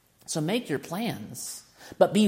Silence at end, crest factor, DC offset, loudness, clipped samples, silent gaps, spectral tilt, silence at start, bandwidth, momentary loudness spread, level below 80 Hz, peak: 0 s; 22 dB; under 0.1%; -30 LUFS; under 0.1%; none; -5 dB/octave; 0.3 s; 16.5 kHz; 13 LU; -70 dBFS; -6 dBFS